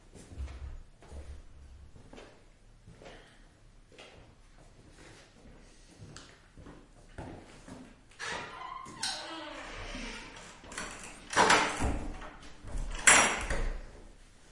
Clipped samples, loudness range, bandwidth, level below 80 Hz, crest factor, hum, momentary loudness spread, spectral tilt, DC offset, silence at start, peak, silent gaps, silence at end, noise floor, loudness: under 0.1%; 26 LU; 11.5 kHz; -46 dBFS; 30 dB; none; 29 LU; -1.5 dB/octave; under 0.1%; 0.05 s; -6 dBFS; none; 0.05 s; -58 dBFS; -30 LUFS